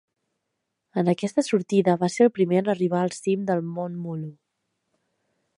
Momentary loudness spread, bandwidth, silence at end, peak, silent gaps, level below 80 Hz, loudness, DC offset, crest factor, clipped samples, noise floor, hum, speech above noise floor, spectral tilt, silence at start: 12 LU; 11.5 kHz; 1.25 s; -6 dBFS; none; -72 dBFS; -24 LUFS; under 0.1%; 20 dB; under 0.1%; -80 dBFS; none; 57 dB; -6.5 dB/octave; 0.95 s